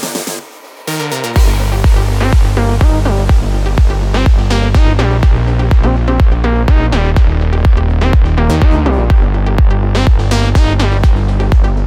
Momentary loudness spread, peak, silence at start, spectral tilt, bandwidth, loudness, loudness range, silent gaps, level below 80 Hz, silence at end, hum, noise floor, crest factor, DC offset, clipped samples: 2 LU; 0 dBFS; 0 s; -6.5 dB/octave; 15.5 kHz; -12 LUFS; 1 LU; none; -10 dBFS; 0 s; none; -32 dBFS; 10 dB; under 0.1%; under 0.1%